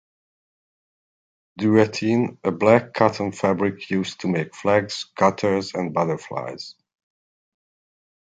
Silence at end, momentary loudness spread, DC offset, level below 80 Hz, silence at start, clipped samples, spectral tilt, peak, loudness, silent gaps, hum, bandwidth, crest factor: 1.5 s; 12 LU; under 0.1%; -58 dBFS; 1.55 s; under 0.1%; -6 dB/octave; -2 dBFS; -22 LUFS; none; none; 9.2 kHz; 22 dB